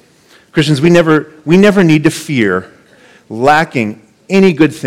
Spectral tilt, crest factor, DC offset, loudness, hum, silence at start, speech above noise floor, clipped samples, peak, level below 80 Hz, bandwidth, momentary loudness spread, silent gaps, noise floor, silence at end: -6 dB/octave; 12 dB; under 0.1%; -11 LUFS; none; 0.55 s; 36 dB; under 0.1%; 0 dBFS; -48 dBFS; 15.5 kHz; 10 LU; none; -46 dBFS; 0 s